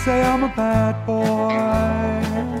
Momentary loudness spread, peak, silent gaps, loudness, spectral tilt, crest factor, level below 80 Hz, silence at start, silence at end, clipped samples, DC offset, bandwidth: 4 LU; -6 dBFS; none; -20 LUFS; -7 dB/octave; 14 dB; -34 dBFS; 0 s; 0 s; under 0.1%; under 0.1%; 15.5 kHz